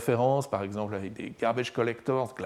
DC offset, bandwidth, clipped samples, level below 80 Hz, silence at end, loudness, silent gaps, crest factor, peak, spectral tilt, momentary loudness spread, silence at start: under 0.1%; 15 kHz; under 0.1%; -68 dBFS; 0 s; -30 LUFS; none; 16 dB; -12 dBFS; -6.5 dB/octave; 9 LU; 0 s